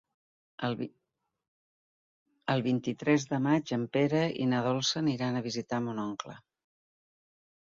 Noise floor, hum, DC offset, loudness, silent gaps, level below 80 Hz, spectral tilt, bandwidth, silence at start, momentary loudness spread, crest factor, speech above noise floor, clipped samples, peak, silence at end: under -90 dBFS; none; under 0.1%; -31 LUFS; 1.48-2.26 s; -72 dBFS; -5.5 dB/octave; 7.6 kHz; 0.6 s; 10 LU; 20 dB; over 60 dB; under 0.1%; -12 dBFS; 1.35 s